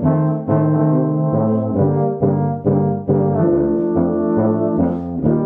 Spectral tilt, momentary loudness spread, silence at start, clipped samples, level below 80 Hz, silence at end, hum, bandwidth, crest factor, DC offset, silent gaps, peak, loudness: -14 dB/octave; 2 LU; 0 s; under 0.1%; -44 dBFS; 0 s; none; 2.3 kHz; 14 dB; under 0.1%; none; -2 dBFS; -17 LUFS